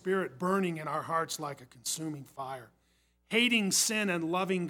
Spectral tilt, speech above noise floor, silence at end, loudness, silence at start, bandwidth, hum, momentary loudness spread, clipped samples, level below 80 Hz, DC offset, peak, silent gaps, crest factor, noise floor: -3 dB/octave; 39 dB; 0 s; -30 LUFS; 0.05 s; 18 kHz; none; 16 LU; under 0.1%; -76 dBFS; under 0.1%; -12 dBFS; none; 20 dB; -71 dBFS